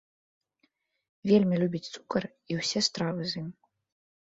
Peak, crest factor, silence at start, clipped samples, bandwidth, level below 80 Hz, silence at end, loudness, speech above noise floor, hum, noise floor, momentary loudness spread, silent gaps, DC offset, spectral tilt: -10 dBFS; 20 dB; 1.25 s; under 0.1%; 8 kHz; -68 dBFS; 0.8 s; -29 LUFS; 46 dB; none; -74 dBFS; 13 LU; none; under 0.1%; -5 dB/octave